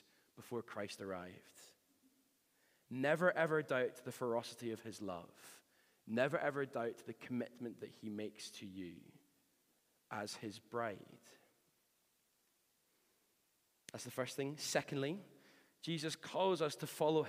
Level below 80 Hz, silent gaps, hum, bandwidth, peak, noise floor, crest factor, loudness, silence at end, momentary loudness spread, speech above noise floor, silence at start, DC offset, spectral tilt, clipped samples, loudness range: -90 dBFS; none; none; 15.5 kHz; -20 dBFS; -79 dBFS; 24 dB; -42 LUFS; 0 s; 18 LU; 38 dB; 0.35 s; under 0.1%; -4.5 dB/octave; under 0.1%; 11 LU